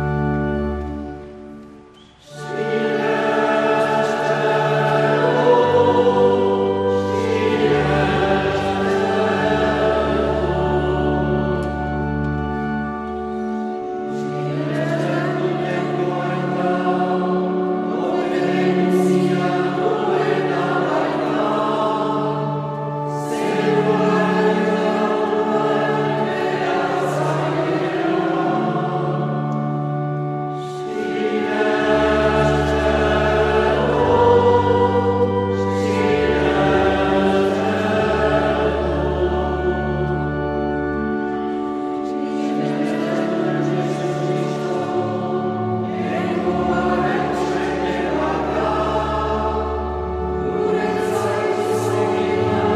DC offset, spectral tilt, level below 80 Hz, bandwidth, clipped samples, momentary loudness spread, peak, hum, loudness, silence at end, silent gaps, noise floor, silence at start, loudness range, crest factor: under 0.1%; -7 dB/octave; -36 dBFS; 13 kHz; under 0.1%; 7 LU; -2 dBFS; none; -19 LUFS; 0 s; none; -45 dBFS; 0 s; 6 LU; 16 dB